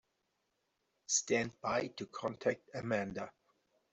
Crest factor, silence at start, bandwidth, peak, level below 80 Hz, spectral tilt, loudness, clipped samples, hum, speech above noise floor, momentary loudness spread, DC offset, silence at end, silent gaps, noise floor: 20 dB; 1.1 s; 8.2 kHz; -20 dBFS; -74 dBFS; -3 dB/octave; -37 LUFS; under 0.1%; none; 45 dB; 12 LU; under 0.1%; 0.6 s; none; -83 dBFS